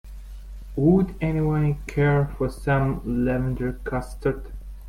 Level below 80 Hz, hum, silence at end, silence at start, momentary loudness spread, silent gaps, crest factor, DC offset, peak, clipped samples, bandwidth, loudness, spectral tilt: -36 dBFS; none; 0 s; 0.05 s; 18 LU; none; 18 dB; under 0.1%; -6 dBFS; under 0.1%; 13 kHz; -24 LUFS; -9 dB/octave